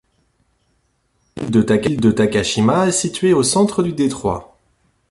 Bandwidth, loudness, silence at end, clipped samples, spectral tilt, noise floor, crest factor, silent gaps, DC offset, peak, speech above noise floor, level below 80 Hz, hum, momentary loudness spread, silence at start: 11.5 kHz; -16 LUFS; 0.65 s; under 0.1%; -5 dB/octave; -64 dBFS; 16 dB; none; under 0.1%; -2 dBFS; 48 dB; -46 dBFS; none; 9 LU; 1.35 s